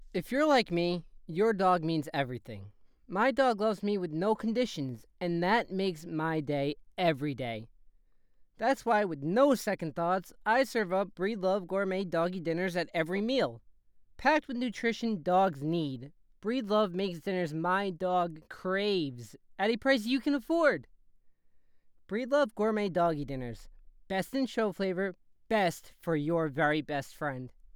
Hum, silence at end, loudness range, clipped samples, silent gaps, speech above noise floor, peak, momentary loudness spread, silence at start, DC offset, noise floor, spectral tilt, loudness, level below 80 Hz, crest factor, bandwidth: none; 0.3 s; 3 LU; under 0.1%; none; 33 dB; -12 dBFS; 11 LU; 0 s; under 0.1%; -63 dBFS; -6 dB/octave; -31 LUFS; -60 dBFS; 20 dB; 20 kHz